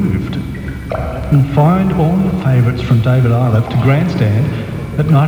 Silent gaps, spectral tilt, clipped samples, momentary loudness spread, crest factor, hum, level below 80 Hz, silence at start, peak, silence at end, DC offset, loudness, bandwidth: none; -9 dB/octave; under 0.1%; 10 LU; 12 dB; none; -30 dBFS; 0 s; 0 dBFS; 0 s; 0.2%; -14 LUFS; 13 kHz